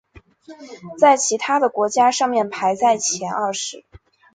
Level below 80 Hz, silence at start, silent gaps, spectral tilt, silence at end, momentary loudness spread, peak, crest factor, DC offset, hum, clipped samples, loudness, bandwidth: -60 dBFS; 0.5 s; none; -2 dB/octave; 0.4 s; 14 LU; -2 dBFS; 18 dB; under 0.1%; none; under 0.1%; -18 LUFS; 9.6 kHz